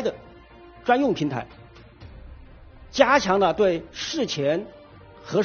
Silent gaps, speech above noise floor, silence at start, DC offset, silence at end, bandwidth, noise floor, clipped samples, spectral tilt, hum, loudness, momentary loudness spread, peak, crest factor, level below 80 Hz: none; 25 dB; 0 s; under 0.1%; 0 s; 6.8 kHz; -47 dBFS; under 0.1%; -3.5 dB/octave; none; -23 LUFS; 23 LU; -2 dBFS; 24 dB; -50 dBFS